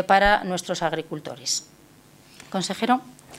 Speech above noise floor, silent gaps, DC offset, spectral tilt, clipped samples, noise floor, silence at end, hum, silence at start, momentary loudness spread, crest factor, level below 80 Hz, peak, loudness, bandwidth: 29 dB; none; under 0.1%; -3 dB/octave; under 0.1%; -52 dBFS; 0 s; none; 0 s; 13 LU; 22 dB; -46 dBFS; -4 dBFS; -24 LUFS; 16 kHz